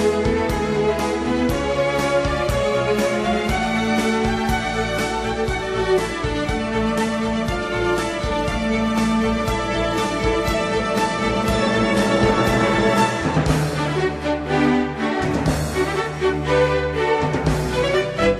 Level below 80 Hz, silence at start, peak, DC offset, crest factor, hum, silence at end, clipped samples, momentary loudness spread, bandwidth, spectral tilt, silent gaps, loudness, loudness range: -34 dBFS; 0 s; -4 dBFS; under 0.1%; 16 dB; none; 0 s; under 0.1%; 5 LU; 14 kHz; -5.5 dB/octave; none; -20 LUFS; 3 LU